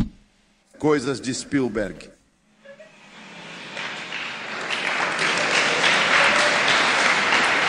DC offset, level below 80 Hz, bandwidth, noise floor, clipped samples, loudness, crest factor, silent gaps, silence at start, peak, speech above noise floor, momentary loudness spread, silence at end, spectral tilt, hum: under 0.1%; -52 dBFS; 10.5 kHz; -60 dBFS; under 0.1%; -20 LUFS; 20 dB; none; 0 s; -4 dBFS; 36 dB; 15 LU; 0 s; -2.5 dB/octave; none